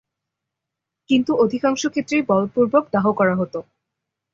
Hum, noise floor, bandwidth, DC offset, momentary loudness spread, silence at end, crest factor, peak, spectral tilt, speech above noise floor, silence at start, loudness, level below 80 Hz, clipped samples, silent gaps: none; -83 dBFS; 7.8 kHz; under 0.1%; 6 LU; 0.75 s; 18 dB; -4 dBFS; -5.5 dB/octave; 65 dB; 1.1 s; -19 LUFS; -60 dBFS; under 0.1%; none